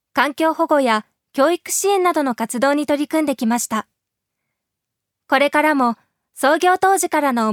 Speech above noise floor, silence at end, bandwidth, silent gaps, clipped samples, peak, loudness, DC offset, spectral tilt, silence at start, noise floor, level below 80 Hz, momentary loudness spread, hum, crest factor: 64 dB; 0 s; 19.5 kHz; none; under 0.1%; 0 dBFS; -18 LUFS; under 0.1%; -3 dB/octave; 0.15 s; -81 dBFS; -68 dBFS; 6 LU; none; 18 dB